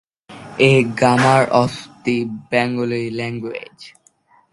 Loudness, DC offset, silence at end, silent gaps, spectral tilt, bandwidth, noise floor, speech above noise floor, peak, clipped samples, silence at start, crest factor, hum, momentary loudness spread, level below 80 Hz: -17 LUFS; under 0.1%; 0.65 s; none; -6 dB/octave; 11.5 kHz; -55 dBFS; 38 dB; 0 dBFS; under 0.1%; 0.3 s; 18 dB; none; 15 LU; -56 dBFS